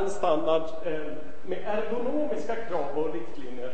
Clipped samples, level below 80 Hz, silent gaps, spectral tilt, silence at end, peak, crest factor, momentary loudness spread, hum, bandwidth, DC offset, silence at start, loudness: under 0.1%; -56 dBFS; none; -5.5 dB/octave; 0 s; -10 dBFS; 18 dB; 12 LU; none; 8.8 kHz; 5%; 0 s; -30 LUFS